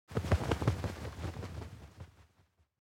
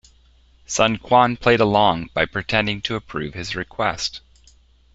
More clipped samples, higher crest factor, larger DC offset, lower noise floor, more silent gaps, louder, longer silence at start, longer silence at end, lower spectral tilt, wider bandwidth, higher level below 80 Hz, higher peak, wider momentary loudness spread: neither; about the same, 22 dB vs 20 dB; neither; first, -71 dBFS vs -54 dBFS; neither; second, -37 LUFS vs -20 LUFS; second, 0.1 s vs 0.7 s; second, 0.6 s vs 0.75 s; first, -6.5 dB/octave vs -4 dB/octave; first, 16.5 kHz vs 8.2 kHz; about the same, -46 dBFS vs -46 dBFS; second, -16 dBFS vs -2 dBFS; first, 20 LU vs 12 LU